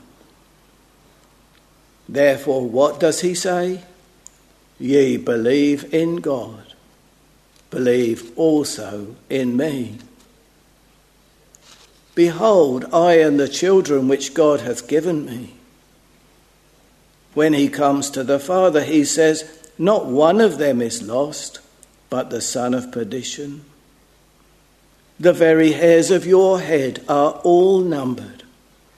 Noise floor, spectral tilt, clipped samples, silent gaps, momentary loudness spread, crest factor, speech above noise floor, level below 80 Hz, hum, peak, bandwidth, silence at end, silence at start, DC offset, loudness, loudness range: -54 dBFS; -5 dB/octave; under 0.1%; none; 14 LU; 18 dB; 37 dB; -60 dBFS; none; 0 dBFS; 13.5 kHz; 0.65 s; 2.1 s; under 0.1%; -17 LUFS; 8 LU